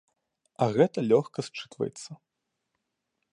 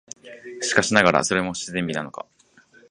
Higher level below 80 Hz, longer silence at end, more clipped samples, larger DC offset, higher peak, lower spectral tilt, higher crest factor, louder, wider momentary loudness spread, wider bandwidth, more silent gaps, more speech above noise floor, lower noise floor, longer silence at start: second, -72 dBFS vs -54 dBFS; first, 1.2 s vs 0.7 s; neither; neither; second, -8 dBFS vs 0 dBFS; first, -6.5 dB/octave vs -3.5 dB/octave; about the same, 22 dB vs 24 dB; second, -27 LUFS vs -21 LUFS; second, 16 LU vs 22 LU; about the same, 11 kHz vs 11 kHz; neither; first, 56 dB vs 33 dB; first, -83 dBFS vs -55 dBFS; first, 0.6 s vs 0.25 s